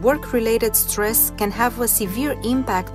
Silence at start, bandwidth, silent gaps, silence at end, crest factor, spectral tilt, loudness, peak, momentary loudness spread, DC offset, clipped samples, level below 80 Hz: 0 s; 16 kHz; none; 0 s; 18 dB; -3.5 dB/octave; -19 LUFS; -2 dBFS; 5 LU; under 0.1%; under 0.1%; -36 dBFS